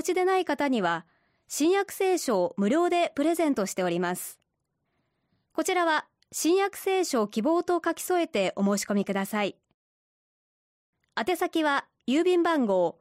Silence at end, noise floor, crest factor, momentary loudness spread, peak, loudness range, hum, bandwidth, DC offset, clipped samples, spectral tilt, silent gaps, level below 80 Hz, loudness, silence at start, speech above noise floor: 0.1 s; -79 dBFS; 14 dB; 7 LU; -14 dBFS; 4 LU; none; 16 kHz; under 0.1%; under 0.1%; -4.5 dB/octave; 9.74-10.93 s; -72 dBFS; -26 LUFS; 0 s; 53 dB